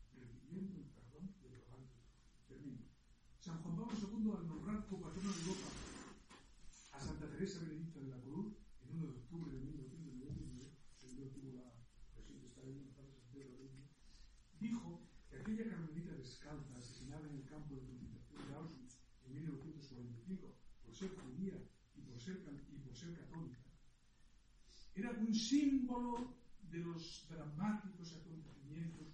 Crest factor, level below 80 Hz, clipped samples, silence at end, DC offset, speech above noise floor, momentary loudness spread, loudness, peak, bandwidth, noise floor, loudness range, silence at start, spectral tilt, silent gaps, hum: 22 dB; -64 dBFS; under 0.1%; 0 s; under 0.1%; 25 dB; 19 LU; -48 LUFS; -26 dBFS; 10.5 kHz; -68 dBFS; 13 LU; 0 s; -6 dB/octave; none; none